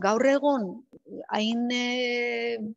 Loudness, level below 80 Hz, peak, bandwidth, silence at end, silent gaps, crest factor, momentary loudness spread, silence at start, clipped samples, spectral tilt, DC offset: -26 LUFS; -76 dBFS; -10 dBFS; 8 kHz; 0.05 s; none; 18 dB; 18 LU; 0 s; under 0.1%; -4 dB/octave; under 0.1%